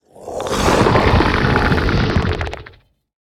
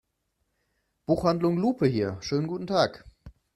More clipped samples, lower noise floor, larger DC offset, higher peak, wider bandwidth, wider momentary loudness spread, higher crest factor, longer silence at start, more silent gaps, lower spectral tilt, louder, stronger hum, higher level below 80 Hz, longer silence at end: neither; second, -45 dBFS vs -77 dBFS; neither; first, 0 dBFS vs -8 dBFS; first, 15 kHz vs 13 kHz; first, 14 LU vs 5 LU; about the same, 16 dB vs 20 dB; second, 0.2 s vs 1.1 s; neither; about the same, -6 dB/octave vs -7 dB/octave; first, -16 LUFS vs -26 LUFS; neither; first, -26 dBFS vs -56 dBFS; first, 0.65 s vs 0.25 s